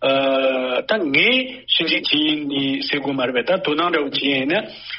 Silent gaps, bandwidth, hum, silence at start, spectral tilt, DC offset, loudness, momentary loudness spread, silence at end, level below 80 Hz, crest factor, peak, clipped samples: none; 5.8 kHz; none; 0 s; -1 dB/octave; under 0.1%; -18 LUFS; 6 LU; 0 s; -62 dBFS; 18 dB; -2 dBFS; under 0.1%